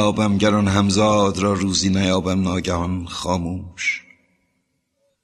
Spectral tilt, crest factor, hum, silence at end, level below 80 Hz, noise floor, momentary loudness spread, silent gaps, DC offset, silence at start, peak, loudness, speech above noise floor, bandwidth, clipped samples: -5 dB/octave; 18 dB; none; 1.25 s; -44 dBFS; -70 dBFS; 8 LU; none; under 0.1%; 0 s; -2 dBFS; -19 LUFS; 51 dB; 11.5 kHz; under 0.1%